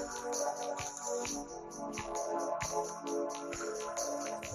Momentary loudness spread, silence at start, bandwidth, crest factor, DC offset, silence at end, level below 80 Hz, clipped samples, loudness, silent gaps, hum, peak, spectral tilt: 5 LU; 0 s; 13 kHz; 16 dB; under 0.1%; 0 s; -62 dBFS; under 0.1%; -38 LUFS; none; none; -22 dBFS; -2.5 dB/octave